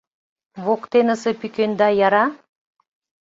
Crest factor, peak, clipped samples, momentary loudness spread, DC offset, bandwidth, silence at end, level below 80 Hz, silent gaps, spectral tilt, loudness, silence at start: 18 dB; -4 dBFS; under 0.1%; 7 LU; under 0.1%; 8 kHz; 0.85 s; -66 dBFS; none; -5.5 dB/octave; -19 LUFS; 0.55 s